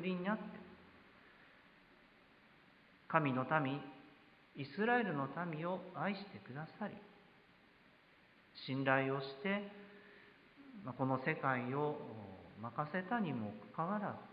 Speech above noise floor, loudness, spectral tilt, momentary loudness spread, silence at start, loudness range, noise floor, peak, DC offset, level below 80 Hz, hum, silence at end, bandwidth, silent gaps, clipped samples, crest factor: 28 dB; -40 LUFS; -5 dB/octave; 22 LU; 0 s; 6 LU; -67 dBFS; -16 dBFS; under 0.1%; -80 dBFS; none; 0 s; 5.2 kHz; none; under 0.1%; 26 dB